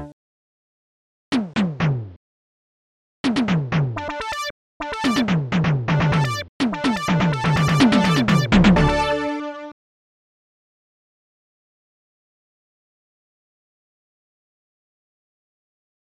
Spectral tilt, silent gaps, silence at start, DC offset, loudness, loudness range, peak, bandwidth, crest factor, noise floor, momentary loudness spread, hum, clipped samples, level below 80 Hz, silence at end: -6 dB/octave; 0.13-1.32 s, 2.16-3.24 s, 4.50-4.80 s, 6.49-6.60 s; 0 s; under 0.1%; -20 LUFS; 9 LU; -4 dBFS; 13.5 kHz; 18 dB; under -90 dBFS; 13 LU; none; under 0.1%; -40 dBFS; 6.4 s